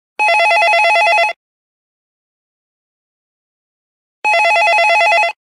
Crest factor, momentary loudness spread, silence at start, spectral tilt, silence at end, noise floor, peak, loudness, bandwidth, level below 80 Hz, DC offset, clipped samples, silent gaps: 12 dB; 4 LU; 0.2 s; 2.5 dB/octave; 0.2 s; under -90 dBFS; -2 dBFS; -11 LUFS; 15.5 kHz; -86 dBFS; under 0.1%; under 0.1%; 1.36-4.22 s